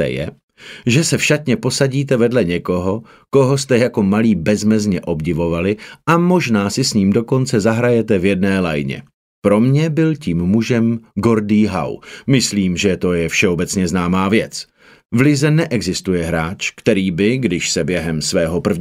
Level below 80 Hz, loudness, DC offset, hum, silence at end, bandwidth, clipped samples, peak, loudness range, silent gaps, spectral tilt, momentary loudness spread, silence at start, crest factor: -44 dBFS; -16 LUFS; under 0.1%; none; 0 s; 16 kHz; under 0.1%; 0 dBFS; 1 LU; 0.43-0.48 s, 9.14-9.42 s, 15.05-15.09 s; -5.5 dB/octave; 7 LU; 0 s; 16 dB